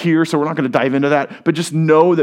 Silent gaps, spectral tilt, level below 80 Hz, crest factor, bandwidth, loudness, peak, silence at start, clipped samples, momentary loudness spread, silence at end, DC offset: none; -6.5 dB/octave; -66 dBFS; 14 dB; 13 kHz; -16 LUFS; 0 dBFS; 0 s; under 0.1%; 6 LU; 0 s; under 0.1%